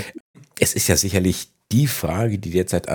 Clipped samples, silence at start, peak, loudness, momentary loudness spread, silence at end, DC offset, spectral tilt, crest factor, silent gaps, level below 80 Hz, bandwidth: under 0.1%; 0 s; 0 dBFS; -20 LUFS; 9 LU; 0 s; under 0.1%; -4.5 dB/octave; 20 dB; 0.20-0.34 s; -42 dBFS; over 20 kHz